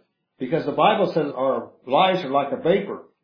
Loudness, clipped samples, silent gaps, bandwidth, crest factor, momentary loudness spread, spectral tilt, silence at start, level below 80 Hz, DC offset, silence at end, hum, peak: -22 LUFS; under 0.1%; none; 5.4 kHz; 18 dB; 9 LU; -7.5 dB/octave; 0.4 s; -70 dBFS; under 0.1%; 0.2 s; none; -4 dBFS